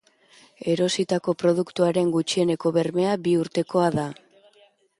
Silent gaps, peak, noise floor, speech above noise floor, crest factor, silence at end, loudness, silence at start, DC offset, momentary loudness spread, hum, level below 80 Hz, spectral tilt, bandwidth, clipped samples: none; -8 dBFS; -59 dBFS; 37 dB; 16 dB; 0.85 s; -23 LUFS; 0.65 s; under 0.1%; 3 LU; none; -64 dBFS; -5.5 dB/octave; 11.5 kHz; under 0.1%